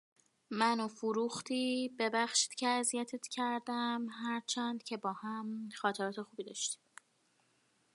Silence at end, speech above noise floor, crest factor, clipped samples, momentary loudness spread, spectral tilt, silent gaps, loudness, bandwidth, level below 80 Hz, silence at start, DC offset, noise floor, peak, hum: 1.2 s; 38 dB; 22 dB; under 0.1%; 9 LU; -2 dB/octave; none; -36 LUFS; 11.5 kHz; -90 dBFS; 0.5 s; under 0.1%; -75 dBFS; -16 dBFS; none